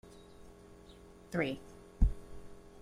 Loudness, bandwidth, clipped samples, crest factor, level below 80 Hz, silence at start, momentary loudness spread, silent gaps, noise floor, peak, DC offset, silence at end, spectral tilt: -37 LUFS; 11 kHz; under 0.1%; 24 dB; -40 dBFS; 0.05 s; 21 LU; none; -56 dBFS; -14 dBFS; under 0.1%; 0.05 s; -7 dB/octave